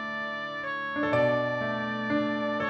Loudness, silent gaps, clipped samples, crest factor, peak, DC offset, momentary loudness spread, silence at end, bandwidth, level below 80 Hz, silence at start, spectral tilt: -29 LUFS; none; under 0.1%; 14 dB; -14 dBFS; under 0.1%; 7 LU; 0 s; 8 kHz; -66 dBFS; 0 s; -7 dB/octave